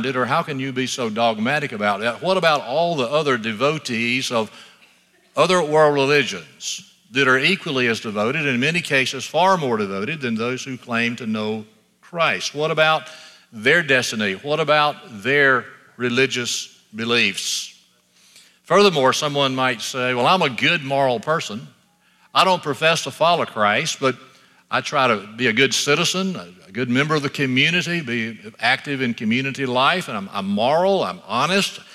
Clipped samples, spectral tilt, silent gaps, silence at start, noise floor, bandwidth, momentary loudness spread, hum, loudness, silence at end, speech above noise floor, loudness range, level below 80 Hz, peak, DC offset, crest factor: under 0.1%; -3.5 dB/octave; none; 0 s; -58 dBFS; 15 kHz; 9 LU; none; -19 LUFS; 0 s; 38 dB; 2 LU; -70 dBFS; -2 dBFS; under 0.1%; 18 dB